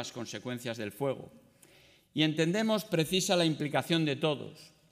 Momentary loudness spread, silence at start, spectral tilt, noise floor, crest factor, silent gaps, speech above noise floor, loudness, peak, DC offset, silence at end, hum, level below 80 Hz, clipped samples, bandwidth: 11 LU; 0 s; -4.5 dB/octave; -61 dBFS; 18 dB; none; 30 dB; -31 LUFS; -14 dBFS; under 0.1%; 0.25 s; none; -72 dBFS; under 0.1%; 16 kHz